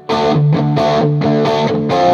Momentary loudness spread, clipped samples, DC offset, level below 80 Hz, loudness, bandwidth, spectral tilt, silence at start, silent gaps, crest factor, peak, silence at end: 2 LU; under 0.1%; under 0.1%; -50 dBFS; -14 LUFS; 7.2 kHz; -7.5 dB/octave; 0.1 s; none; 12 dB; 0 dBFS; 0 s